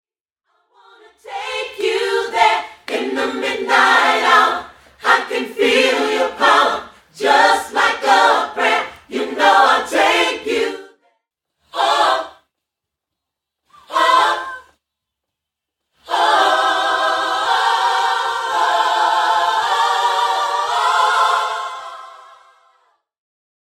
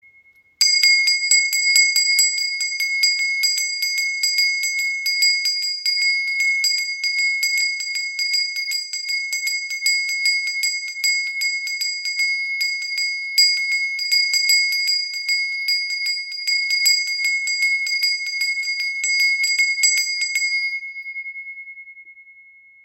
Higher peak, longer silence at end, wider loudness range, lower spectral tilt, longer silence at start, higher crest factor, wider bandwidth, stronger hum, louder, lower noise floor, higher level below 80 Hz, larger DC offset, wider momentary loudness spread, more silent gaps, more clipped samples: about the same, 0 dBFS vs -2 dBFS; first, 1.5 s vs 0.45 s; about the same, 6 LU vs 4 LU; first, -0.5 dB/octave vs 8 dB/octave; first, 1.25 s vs 0.6 s; about the same, 18 dB vs 18 dB; about the same, 16.5 kHz vs 17 kHz; neither; about the same, -16 LUFS vs -17 LUFS; first, -82 dBFS vs -54 dBFS; first, -62 dBFS vs -82 dBFS; neither; first, 12 LU vs 8 LU; neither; neither